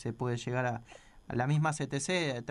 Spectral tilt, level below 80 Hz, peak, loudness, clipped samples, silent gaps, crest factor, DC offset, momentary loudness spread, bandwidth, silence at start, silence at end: -5 dB/octave; -62 dBFS; -18 dBFS; -33 LUFS; under 0.1%; none; 16 dB; under 0.1%; 6 LU; 11.5 kHz; 0 s; 0 s